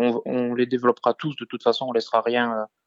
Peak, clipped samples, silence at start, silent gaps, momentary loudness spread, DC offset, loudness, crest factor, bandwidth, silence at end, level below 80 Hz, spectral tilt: -6 dBFS; under 0.1%; 0 s; none; 4 LU; under 0.1%; -23 LUFS; 18 dB; 7.6 kHz; 0.2 s; -76 dBFS; -6.5 dB/octave